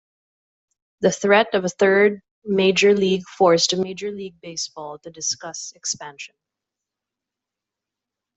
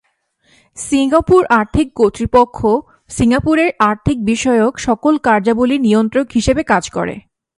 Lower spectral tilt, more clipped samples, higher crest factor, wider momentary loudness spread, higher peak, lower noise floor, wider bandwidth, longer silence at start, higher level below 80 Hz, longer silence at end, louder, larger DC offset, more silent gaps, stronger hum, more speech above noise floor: second, -3.5 dB/octave vs -5.5 dB/octave; neither; first, 20 dB vs 14 dB; first, 18 LU vs 7 LU; about the same, -2 dBFS vs 0 dBFS; first, -86 dBFS vs -59 dBFS; second, 8.2 kHz vs 11.5 kHz; first, 1 s vs 0.75 s; second, -66 dBFS vs -36 dBFS; first, 2.1 s vs 0.4 s; second, -20 LUFS vs -14 LUFS; neither; first, 2.31-2.42 s vs none; neither; first, 66 dB vs 46 dB